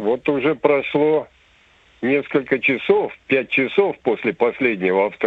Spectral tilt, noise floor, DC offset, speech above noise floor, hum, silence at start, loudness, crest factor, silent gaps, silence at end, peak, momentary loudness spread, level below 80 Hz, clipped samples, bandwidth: -8 dB/octave; -54 dBFS; under 0.1%; 35 dB; none; 0 s; -19 LUFS; 18 dB; none; 0 s; -2 dBFS; 4 LU; -62 dBFS; under 0.1%; 4.7 kHz